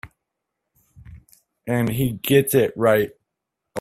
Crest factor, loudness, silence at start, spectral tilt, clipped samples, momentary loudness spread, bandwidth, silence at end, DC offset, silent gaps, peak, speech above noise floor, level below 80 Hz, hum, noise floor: 20 dB; -20 LUFS; 0.05 s; -5.5 dB/octave; under 0.1%; 13 LU; 16 kHz; 0 s; under 0.1%; none; -2 dBFS; 62 dB; -52 dBFS; none; -81 dBFS